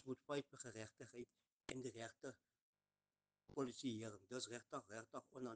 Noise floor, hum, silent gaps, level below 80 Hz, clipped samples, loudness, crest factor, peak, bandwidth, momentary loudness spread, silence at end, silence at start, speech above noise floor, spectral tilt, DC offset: under -90 dBFS; 50 Hz at -90 dBFS; 1.52-1.60 s, 2.61-2.73 s; -84 dBFS; under 0.1%; -52 LUFS; 22 dB; -32 dBFS; 9.6 kHz; 10 LU; 0 s; 0 s; over 38 dB; -4.5 dB/octave; under 0.1%